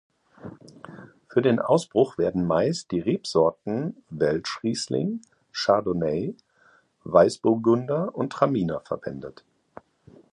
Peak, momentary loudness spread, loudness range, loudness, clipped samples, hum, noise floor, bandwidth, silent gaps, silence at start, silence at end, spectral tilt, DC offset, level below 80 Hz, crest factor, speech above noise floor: -4 dBFS; 22 LU; 3 LU; -24 LUFS; under 0.1%; none; -60 dBFS; 11.5 kHz; none; 0.45 s; 1.05 s; -6 dB/octave; under 0.1%; -58 dBFS; 20 dB; 37 dB